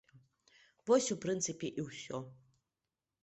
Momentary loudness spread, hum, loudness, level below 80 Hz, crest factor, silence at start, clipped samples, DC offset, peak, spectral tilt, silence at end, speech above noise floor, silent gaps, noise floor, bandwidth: 15 LU; none; -36 LUFS; -76 dBFS; 20 dB; 0.85 s; under 0.1%; under 0.1%; -18 dBFS; -4 dB/octave; 0.9 s; over 55 dB; none; under -90 dBFS; 8.2 kHz